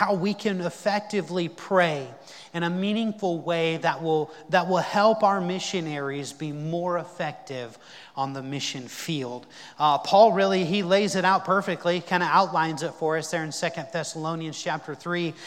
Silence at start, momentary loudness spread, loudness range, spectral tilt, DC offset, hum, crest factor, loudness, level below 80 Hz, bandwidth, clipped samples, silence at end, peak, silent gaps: 0 s; 12 LU; 9 LU; -5 dB/octave; under 0.1%; none; 20 dB; -25 LUFS; -76 dBFS; 16.5 kHz; under 0.1%; 0 s; -6 dBFS; none